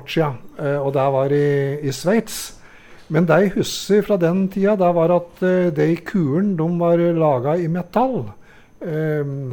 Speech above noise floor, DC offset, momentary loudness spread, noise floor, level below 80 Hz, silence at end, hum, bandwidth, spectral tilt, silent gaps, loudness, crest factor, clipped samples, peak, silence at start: 25 dB; under 0.1%; 8 LU; -43 dBFS; -50 dBFS; 0 s; none; 18 kHz; -6.5 dB/octave; none; -19 LUFS; 16 dB; under 0.1%; -4 dBFS; 0 s